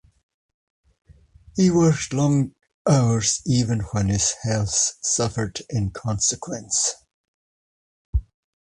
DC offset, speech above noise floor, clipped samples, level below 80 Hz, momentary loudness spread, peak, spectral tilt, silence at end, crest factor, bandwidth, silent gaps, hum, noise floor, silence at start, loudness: under 0.1%; 29 dB; under 0.1%; -38 dBFS; 11 LU; -6 dBFS; -4.5 dB/octave; 0.5 s; 18 dB; 11.5 kHz; 2.74-2.85 s, 7.14-8.13 s; none; -51 dBFS; 1.55 s; -22 LUFS